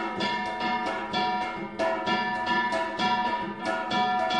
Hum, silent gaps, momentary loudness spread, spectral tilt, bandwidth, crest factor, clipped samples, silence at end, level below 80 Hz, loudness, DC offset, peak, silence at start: none; none; 5 LU; -4 dB/octave; 11 kHz; 14 dB; under 0.1%; 0 s; -62 dBFS; -27 LUFS; 0.1%; -14 dBFS; 0 s